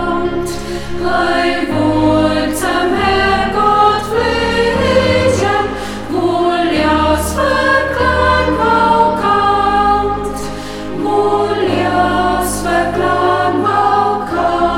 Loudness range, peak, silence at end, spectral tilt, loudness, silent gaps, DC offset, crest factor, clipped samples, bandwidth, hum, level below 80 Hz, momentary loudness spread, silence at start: 2 LU; 0 dBFS; 0 s; -5 dB/octave; -13 LUFS; none; 0.7%; 12 dB; under 0.1%; 16.5 kHz; none; -30 dBFS; 8 LU; 0 s